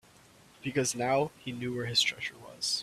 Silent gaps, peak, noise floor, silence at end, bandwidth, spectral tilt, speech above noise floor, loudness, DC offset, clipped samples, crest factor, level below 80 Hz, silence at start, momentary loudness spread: none; -14 dBFS; -58 dBFS; 0 s; 15.5 kHz; -3 dB/octave; 27 dB; -31 LUFS; under 0.1%; under 0.1%; 20 dB; -66 dBFS; 0.6 s; 12 LU